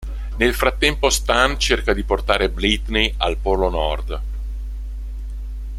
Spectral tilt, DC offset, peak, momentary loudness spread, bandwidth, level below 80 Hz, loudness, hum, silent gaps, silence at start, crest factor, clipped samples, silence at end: -3.5 dB/octave; under 0.1%; 0 dBFS; 15 LU; 15 kHz; -26 dBFS; -19 LUFS; none; none; 0 s; 20 dB; under 0.1%; 0 s